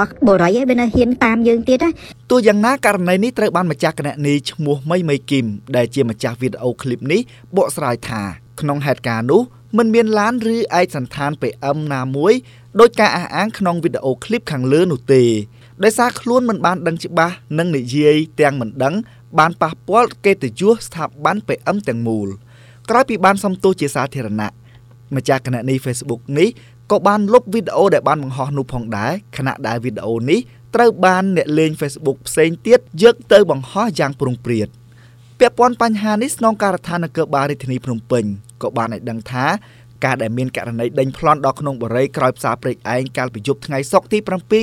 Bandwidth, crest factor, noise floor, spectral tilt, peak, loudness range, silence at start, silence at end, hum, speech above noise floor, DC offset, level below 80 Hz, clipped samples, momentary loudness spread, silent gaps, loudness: 16 kHz; 16 dB; -43 dBFS; -6 dB/octave; 0 dBFS; 5 LU; 0 s; 0 s; none; 27 dB; under 0.1%; -50 dBFS; 0.1%; 9 LU; none; -17 LUFS